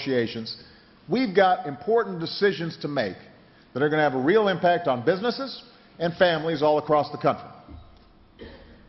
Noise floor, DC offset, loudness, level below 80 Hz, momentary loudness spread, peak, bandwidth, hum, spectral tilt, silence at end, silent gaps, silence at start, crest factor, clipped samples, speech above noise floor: -53 dBFS; under 0.1%; -24 LUFS; -60 dBFS; 14 LU; -6 dBFS; 6 kHz; none; -7.5 dB/octave; 0.15 s; none; 0 s; 20 dB; under 0.1%; 29 dB